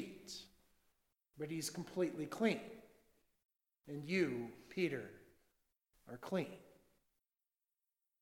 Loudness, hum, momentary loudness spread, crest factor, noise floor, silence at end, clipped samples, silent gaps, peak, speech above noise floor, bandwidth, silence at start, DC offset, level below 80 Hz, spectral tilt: -42 LUFS; none; 18 LU; 24 dB; under -90 dBFS; 1.5 s; under 0.1%; 3.45-3.49 s; -22 dBFS; over 49 dB; 16.5 kHz; 0 s; under 0.1%; -78 dBFS; -5 dB/octave